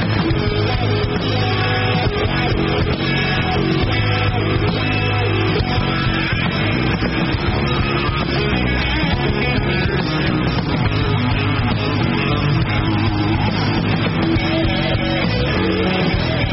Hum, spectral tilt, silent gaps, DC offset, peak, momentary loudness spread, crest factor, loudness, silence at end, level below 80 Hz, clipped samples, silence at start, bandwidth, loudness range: none; -4.5 dB/octave; none; 0.1%; -6 dBFS; 1 LU; 12 dB; -18 LUFS; 0 s; -28 dBFS; under 0.1%; 0 s; 6 kHz; 0 LU